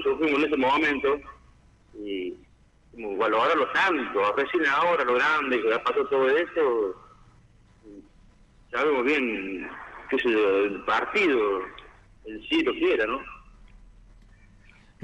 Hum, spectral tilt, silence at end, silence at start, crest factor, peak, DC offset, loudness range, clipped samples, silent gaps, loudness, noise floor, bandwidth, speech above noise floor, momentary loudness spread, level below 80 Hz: none; -4.5 dB/octave; 1.65 s; 0 s; 14 dB; -12 dBFS; under 0.1%; 6 LU; under 0.1%; none; -24 LUFS; -56 dBFS; 9.6 kHz; 32 dB; 13 LU; -56 dBFS